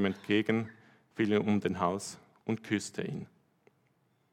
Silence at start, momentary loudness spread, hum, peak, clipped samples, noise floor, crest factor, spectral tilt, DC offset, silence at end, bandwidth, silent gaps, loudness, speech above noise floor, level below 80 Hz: 0 s; 15 LU; none; -14 dBFS; under 0.1%; -72 dBFS; 20 dB; -5.5 dB/octave; under 0.1%; 1.05 s; 13 kHz; none; -32 LUFS; 41 dB; -78 dBFS